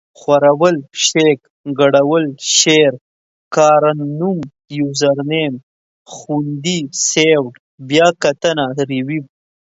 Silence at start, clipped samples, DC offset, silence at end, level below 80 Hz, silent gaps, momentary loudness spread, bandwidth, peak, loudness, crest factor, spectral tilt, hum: 0.2 s; under 0.1%; under 0.1%; 0.5 s; -62 dBFS; 1.50-1.64 s, 3.01-3.51 s, 5.63-6.05 s, 7.59-7.78 s; 11 LU; 8 kHz; 0 dBFS; -14 LUFS; 16 dB; -3.5 dB/octave; none